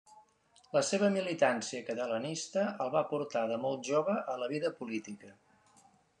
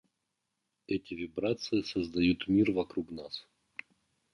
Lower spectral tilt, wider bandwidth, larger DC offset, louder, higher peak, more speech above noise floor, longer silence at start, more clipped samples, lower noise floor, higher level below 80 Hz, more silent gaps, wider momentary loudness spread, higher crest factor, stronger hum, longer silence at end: second, -4.5 dB/octave vs -6.5 dB/octave; about the same, 10.5 kHz vs 10.5 kHz; neither; about the same, -33 LUFS vs -32 LUFS; about the same, -14 dBFS vs -16 dBFS; second, 33 dB vs 52 dB; second, 0.1 s vs 0.9 s; neither; second, -66 dBFS vs -84 dBFS; second, -84 dBFS vs -58 dBFS; neither; second, 9 LU vs 19 LU; about the same, 20 dB vs 18 dB; neither; about the same, 0.9 s vs 0.9 s